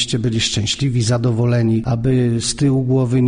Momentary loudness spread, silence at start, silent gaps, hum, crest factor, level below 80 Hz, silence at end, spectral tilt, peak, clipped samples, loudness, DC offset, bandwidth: 2 LU; 0 s; none; none; 12 dB; -40 dBFS; 0 s; -5.5 dB/octave; -4 dBFS; under 0.1%; -17 LUFS; under 0.1%; 10 kHz